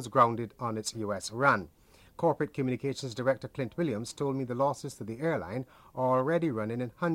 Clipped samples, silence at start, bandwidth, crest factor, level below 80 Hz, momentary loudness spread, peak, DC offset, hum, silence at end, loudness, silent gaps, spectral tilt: under 0.1%; 0 s; 16 kHz; 20 dB; -64 dBFS; 9 LU; -10 dBFS; under 0.1%; none; 0 s; -31 LUFS; none; -6 dB/octave